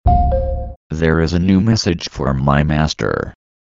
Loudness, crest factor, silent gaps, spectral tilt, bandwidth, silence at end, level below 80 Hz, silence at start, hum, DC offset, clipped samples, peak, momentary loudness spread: -16 LUFS; 14 dB; 0.76-0.90 s; -6.5 dB/octave; 7.8 kHz; 0.35 s; -24 dBFS; 0.05 s; none; under 0.1%; under 0.1%; 0 dBFS; 10 LU